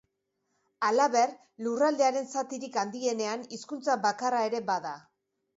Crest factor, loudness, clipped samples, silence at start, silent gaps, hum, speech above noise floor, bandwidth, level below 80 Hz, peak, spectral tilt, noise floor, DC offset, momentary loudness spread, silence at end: 18 dB; -29 LUFS; under 0.1%; 0.8 s; none; none; 51 dB; 8 kHz; -82 dBFS; -12 dBFS; -3 dB/octave; -80 dBFS; under 0.1%; 11 LU; 0.6 s